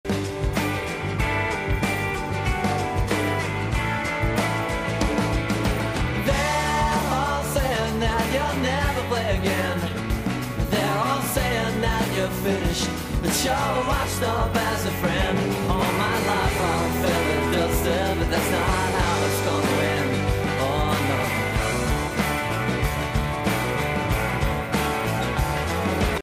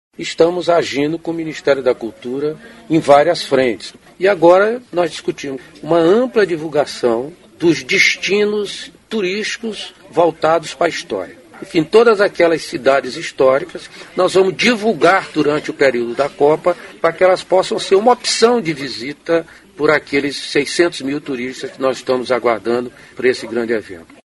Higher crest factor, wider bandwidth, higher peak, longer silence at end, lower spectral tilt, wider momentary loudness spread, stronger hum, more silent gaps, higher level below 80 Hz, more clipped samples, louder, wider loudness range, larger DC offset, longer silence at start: about the same, 14 dB vs 16 dB; first, 16 kHz vs 11.5 kHz; second, -8 dBFS vs 0 dBFS; second, 0 s vs 0.25 s; about the same, -5 dB/octave vs -4 dB/octave; second, 3 LU vs 13 LU; neither; neither; first, -32 dBFS vs -56 dBFS; neither; second, -23 LUFS vs -16 LUFS; about the same, 2 LU vs 4 LU; neither; second, 0.05 s vs 0.2 s